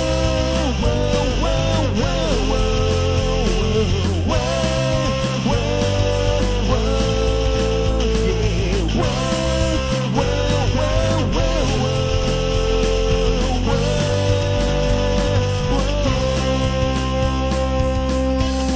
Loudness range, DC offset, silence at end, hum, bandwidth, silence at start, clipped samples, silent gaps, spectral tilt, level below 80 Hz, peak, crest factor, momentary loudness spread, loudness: 0 LU; under 0.1%; 0 s; none; 8 kHz; 0 s; under 0.1%; none; -5.5 dB/octave; -22 dBFS; -4 dBFS; 12 dB; 1 LU; -19 LUFS